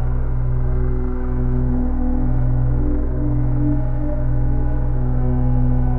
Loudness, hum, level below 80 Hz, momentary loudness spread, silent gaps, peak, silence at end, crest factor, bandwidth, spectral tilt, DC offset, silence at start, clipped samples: -21 LUFS; none; -18 dBFS; 4 LU; none; -6 dBFS; 0 s; 10 dB; 2.3 kHz; -12.5 dB/octave; 0.4%; 0 s; under 0.1%